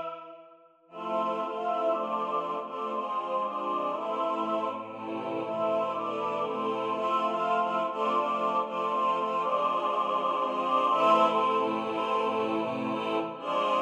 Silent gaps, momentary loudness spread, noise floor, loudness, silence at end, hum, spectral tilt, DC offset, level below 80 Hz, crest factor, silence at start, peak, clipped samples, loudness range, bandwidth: none; 8 LU; -56 dBFS; -29 LUFS; 0 s; none; -5.5 dB/octave; under 0.1%; -80 dBFS; 18 dB; 0 s; -10 dBFS; under 0.1%; 5 LU; 10 kHz